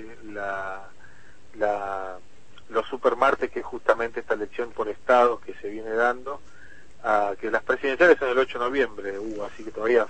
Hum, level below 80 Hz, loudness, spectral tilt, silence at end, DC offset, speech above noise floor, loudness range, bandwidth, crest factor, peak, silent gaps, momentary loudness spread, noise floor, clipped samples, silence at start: none; -56 dBFS; -25 LUFS; -4.5 dB/octave; 0 s; 1%; 30 dB; 4 LU; 8.8 kHz; 22 dB; -4 dBFS; none; 16 LU; -54 dBFS; under 0.1%; 0 s